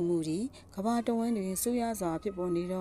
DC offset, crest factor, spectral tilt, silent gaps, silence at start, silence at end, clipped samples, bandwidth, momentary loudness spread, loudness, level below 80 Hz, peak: under 0.1%; 14 dB; -5.5 dB/octave; none; 0 s; 0 s; under 0.1%; 15.5 kHz; 5 LU; -32 LUFS; -58 dBFS; -18 dBFS